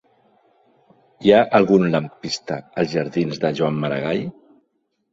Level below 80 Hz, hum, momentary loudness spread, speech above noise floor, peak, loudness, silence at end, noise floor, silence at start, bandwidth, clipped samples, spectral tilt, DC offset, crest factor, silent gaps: -58 dBFS; none; 12 LU; 51 dB; -2 dBFS; -20 LUFS; 0.8 s; -70 dBFS; 1.2 s; 7.8 kHz; under 0.1%; -6.5 dB/octave; under 0.1%; 20 dB; none